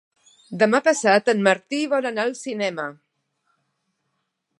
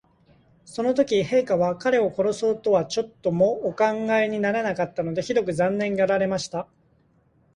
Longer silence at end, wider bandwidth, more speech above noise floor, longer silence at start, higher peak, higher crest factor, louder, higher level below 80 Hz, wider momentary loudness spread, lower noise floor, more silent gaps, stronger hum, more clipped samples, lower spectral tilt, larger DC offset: first, 1.65 s vs 0.9 s; about the same, 11.5 kHz vs 11 kHz; first, 55 dB vs 39 dB; second, 0.5 s vs 0.7 s; first, -2 dBFS vs -8 dBFS; first, 22 dB vs 16 dB; about the same, -21 LUFS vs -23 LUFS; second, -78 dBFS vs -60 dBFS; first, 11 LU vs 7 LU; first, -75 dBFS vs -62 dBFS; neither; neither; neither; second, -4 dB/octave vs -5.5 dB/octave; neither